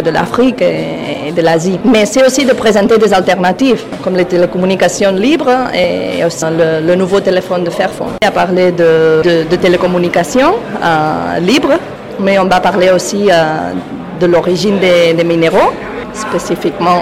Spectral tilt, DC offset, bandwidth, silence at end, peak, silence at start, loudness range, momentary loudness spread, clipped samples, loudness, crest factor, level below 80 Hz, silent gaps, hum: -5 dB/octave; 0.3%; 16 kHz; 0 s; 0 dBFS; 0 s; 2 LU; 7 LU; under 0.1%; -11 LUFS; 10 dB; -42 dBFS; none; none